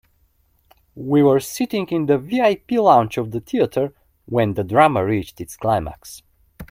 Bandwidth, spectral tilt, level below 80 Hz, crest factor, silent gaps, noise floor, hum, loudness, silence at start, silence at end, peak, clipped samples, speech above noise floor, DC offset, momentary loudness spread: 16.5 kHz; -6.5 dB/octave; -50 dBFS; 20 dB; none; -61 dBFS; none; -19 LUFS; 0.95 s; 0.05 s; 0 dBFS; under 0.1%; 43 dB; under 0.1%; 12 LU